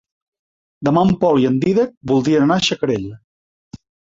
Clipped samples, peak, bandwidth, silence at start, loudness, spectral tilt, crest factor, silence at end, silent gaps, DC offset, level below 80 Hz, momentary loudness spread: under 0.1%; -4 dBFS; 7.8 kHz; 0.8 s; -16 LUFS; -6 dB/octave; 14 dB; 0.4 s; 1.97-2.01 s, 3.24-3.71 s; under 0.1%; -50 dBFS; 8 LU